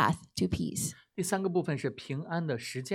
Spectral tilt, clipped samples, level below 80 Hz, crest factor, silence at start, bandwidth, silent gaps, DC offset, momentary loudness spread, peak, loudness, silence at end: -5 dB/octave; under 0.1%; -56 dBFS; 22 dB; 0 s; 16.5 kHz; none; under 0.1%; 6 LU; -10 dBFS; -33 LUFS; 0 s